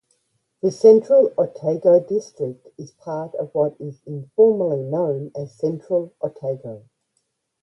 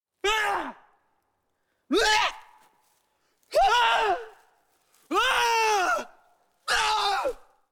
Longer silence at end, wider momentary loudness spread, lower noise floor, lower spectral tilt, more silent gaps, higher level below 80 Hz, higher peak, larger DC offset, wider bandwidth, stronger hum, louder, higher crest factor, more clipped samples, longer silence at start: first, 0.85 s vs 0.35 s; first, 18 LU vs 11 LU; about the same, -72 dBFS vs -75 dBFS; first, -8.5 dB/octave vs -0.5 dB/octave; neither; second, -68 dBFS vs -52 dBFS; first, -2 dBFS vs -8 dBFS; neither; second, 7.2 kHz vs 18.5 kHz; neither; first, -20 LUFS vs -24 LUFS; about the same, 18 dB vs 18 dB; neither; first, 0.65 s vs 0.25 s